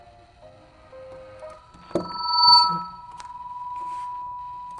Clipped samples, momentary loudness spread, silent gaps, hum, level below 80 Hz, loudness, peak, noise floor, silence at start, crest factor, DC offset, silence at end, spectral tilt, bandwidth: under 0.1%; 29 LU; none; none; -58 dBFS; -20 LUFS; -4 dBFS; -50 dBFS; 0.4 s; 22 dB; under 0.1%; 0 s; -3.5 dB/octave; 11 kHz